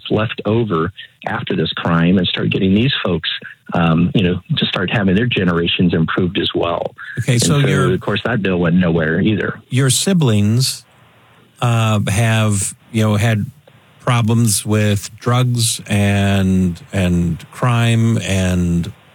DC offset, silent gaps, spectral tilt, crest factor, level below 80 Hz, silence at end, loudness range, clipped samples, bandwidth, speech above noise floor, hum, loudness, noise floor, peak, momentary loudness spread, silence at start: under 0.1%; none; -5 dB/octave; 16 dB; -48 dBFS; 0.2 s; 1 LU; under 0.1%; 17.5 kHz; 33 dB; none; -16 LUFS; -49 dBFS; 0 dBFS; 6 LU; 0.05 s